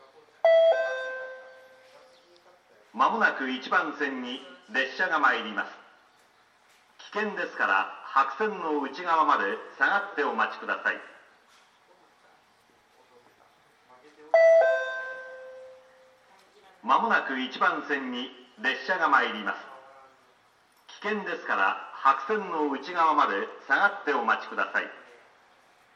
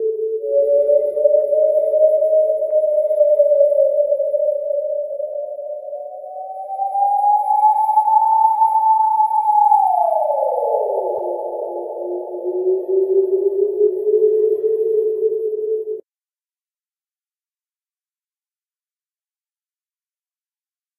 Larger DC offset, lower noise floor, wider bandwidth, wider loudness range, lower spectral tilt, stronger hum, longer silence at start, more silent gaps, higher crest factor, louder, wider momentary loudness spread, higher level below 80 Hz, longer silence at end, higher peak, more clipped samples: neither; second, -63 dBFS vs under -90 dBFS; second, 7.6 kHz vs 13 kHz; second, 4 LU vs 7 LU; second, -4 dB/octave vs -7.5 dB/octave; neither; first, 0.45 s vs 0 s; neither; first, 22 dB vs 14 dB; second, -26 LUFS vs -17 LUFS; first, 15 LU vs 12 LU; second, -88 dBFS vs -76 dBFS; second, 0.95 s vs 5 s; second, -6 dBFS vs -2 dBFS; neither